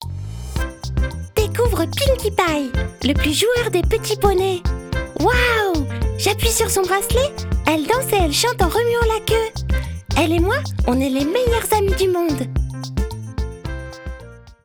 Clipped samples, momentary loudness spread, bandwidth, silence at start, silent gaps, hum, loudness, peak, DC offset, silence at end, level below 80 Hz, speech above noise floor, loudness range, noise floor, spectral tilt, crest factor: under 0.1%; 10 LU; over 20 kHz; 0 s; none; none; -19 LUFS; 0 dBFS; under 0.1%; 0.1 s; -26 dBFS; 22 dB; 2 LU; -39 dBFS; -4.5 dB/octave; 18 dB